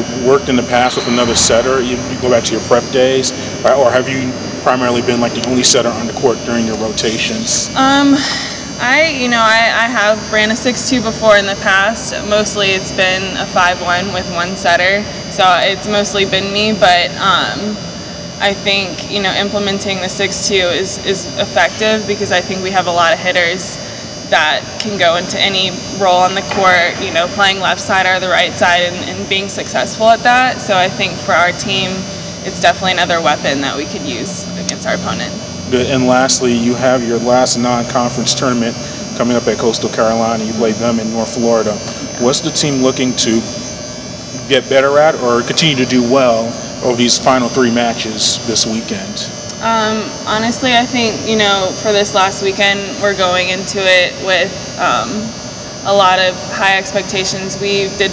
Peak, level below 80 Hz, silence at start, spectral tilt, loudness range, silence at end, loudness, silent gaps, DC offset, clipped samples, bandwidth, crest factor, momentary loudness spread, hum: 0 dBFS; -40 dBFS; 0 s; -3 dB/octave; 3 LU; 0 s; -13 LUFS; none; under 0.1%; 0.2%; 8 kHz; 14 dB; 9 LU; none